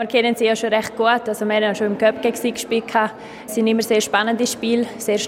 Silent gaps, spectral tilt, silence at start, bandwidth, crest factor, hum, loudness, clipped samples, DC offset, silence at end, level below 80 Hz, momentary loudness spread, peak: none; -3.5 dB/octave; 0 s; 16.5 kHz; 16 dB; none; -19 LUFS; under 0.1%; under 0.1%; 0 s; -62 dBFS; 5 LU; -2 dBFS